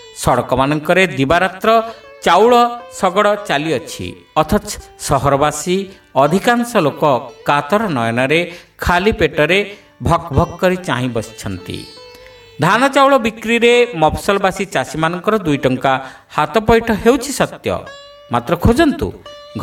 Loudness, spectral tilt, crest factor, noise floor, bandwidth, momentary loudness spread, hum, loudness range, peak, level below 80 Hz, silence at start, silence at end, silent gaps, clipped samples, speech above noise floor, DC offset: -15 LUFS; -5 dB/octave; 16 dB; -39 dBFS; 16.5 kHz; 12 LU; none; 3 LU; 0 dBFS; -36 dBFS; 0 s; 0 s; none; under 0.1%; 25 dB; under 0.1%